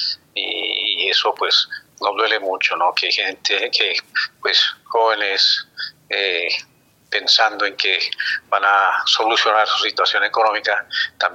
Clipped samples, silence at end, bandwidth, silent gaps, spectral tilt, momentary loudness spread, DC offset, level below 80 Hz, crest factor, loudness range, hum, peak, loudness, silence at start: under 0.1%; 0 s; 16.5 kHz; none; 0.5 dB/octave; 8 LU; under 0.1%; -74 dBFS; 18 dB; 2 LU; none; 0 dBFS; -17 LUFS; 0 s